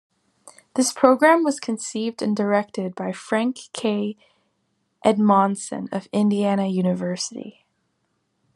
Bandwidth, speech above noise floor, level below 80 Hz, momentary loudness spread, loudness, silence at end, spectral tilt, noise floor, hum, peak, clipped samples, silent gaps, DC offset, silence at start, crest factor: 12.5 kHz; 50 dB; -74 dBFS; 13 LU; -22 LUFS; 1.05 s; -5 dB/octave; -72 dBFS; none; 0 dBFS; under 0.1%; none; under 0.1%; 0.45 s; 22 dB